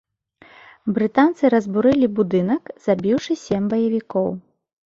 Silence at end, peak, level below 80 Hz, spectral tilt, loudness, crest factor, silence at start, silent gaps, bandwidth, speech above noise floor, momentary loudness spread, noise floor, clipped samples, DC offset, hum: 0.55 s; -4 dBFS; -56 dBFS; -7.5 dB/octave; -20 LUFS; 16 dB; 0.85 s; none; 7.6 kHz; 33 dB; 7 LU; -52 dBFS; under 0.1%; under 0.1%; none